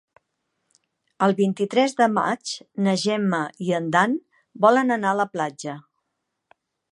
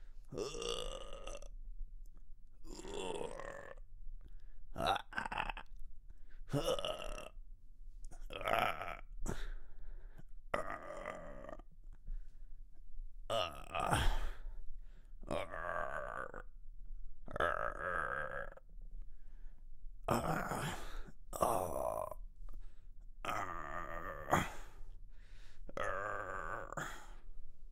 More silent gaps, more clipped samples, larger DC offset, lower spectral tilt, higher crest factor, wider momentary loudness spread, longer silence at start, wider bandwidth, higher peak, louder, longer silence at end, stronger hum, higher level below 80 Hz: neither; neither; neither; first, -5.5 dB/octave vs -4 dB/octave; about the same, 20 dB vs 24 dB; second, 11 LU vs 24 LU; first, 1.2 s vs 0 s; second, 11 kHz vs 16 kHz; first, -4 dBFS vs -16 dBFS; first, -22 LUFS vs -41 LUFS; first, 1.1 s vs 0 s; neither; second, -74 dBFS vs -48 dBFS